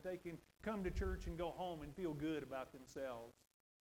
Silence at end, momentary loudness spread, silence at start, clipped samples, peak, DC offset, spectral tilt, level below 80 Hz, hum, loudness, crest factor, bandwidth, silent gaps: 0.5 s; 9 LU; 0 s; under 0.1%; -30 dBFS; under 0.1%; -6.5 dB/octave; -54 dBFS; none; -47 LUFS; 16 dB; 17 kHz; none